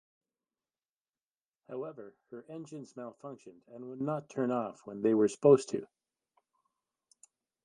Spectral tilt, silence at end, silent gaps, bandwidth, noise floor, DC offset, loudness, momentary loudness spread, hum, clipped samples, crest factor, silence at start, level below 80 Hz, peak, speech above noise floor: -7 dB/octave; 1.8 s; none; 10.5 kHz; under -90 dBFS; under 0.1%; -31 LUFS; 24 LU; none; under 0.1%; 24 dB; 1.7 s; -82 dBFS; -10 dBFS; over 58 dB